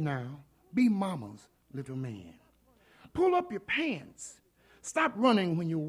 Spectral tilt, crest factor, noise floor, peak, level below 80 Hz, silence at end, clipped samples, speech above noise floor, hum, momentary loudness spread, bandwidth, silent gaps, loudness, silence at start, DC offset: -5.5 dB/octave; 18 dB; -64 dBFS; -14 dBFS; -66 dBFS; 0 s; under 0.1%; 34 dB; none; 20 LU; 12.5 kHz; none; -31 LUFS; 0 s; under 0.1%